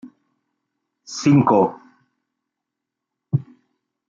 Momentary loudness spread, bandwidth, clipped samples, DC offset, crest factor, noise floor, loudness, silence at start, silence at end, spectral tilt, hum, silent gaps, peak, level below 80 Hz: 11 LU; 7.6 kHz; under 0.1%; under 0.1%; 20 dB; -83 dBFS; -19 LUFS; 0.05 s; 0.7 s; -7 dB/octave; none; none; -4 dBFS; -66 dBFS